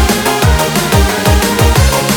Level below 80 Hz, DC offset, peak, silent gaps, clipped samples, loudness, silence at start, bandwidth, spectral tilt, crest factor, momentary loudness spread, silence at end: -16 dBFS; under 0.1%; 0 dBFS; none; under 0.1%; -10 LUFS; 0 s; over 20 kHz; -4.5 dB/octave; 10 dB; 2 LU; 0 s